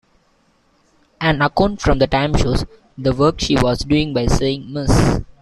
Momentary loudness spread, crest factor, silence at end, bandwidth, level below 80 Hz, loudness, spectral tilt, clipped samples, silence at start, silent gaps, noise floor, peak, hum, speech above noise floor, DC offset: 6 LU; 16 dB; 0.15 s; 13 kHz; -26 dBFS; -17 LUFS; -6 dB/octave; under 0.1%; 1.2 s; none; -59 dBFS; 0 dBFS; none; 43 dB; under 0.1%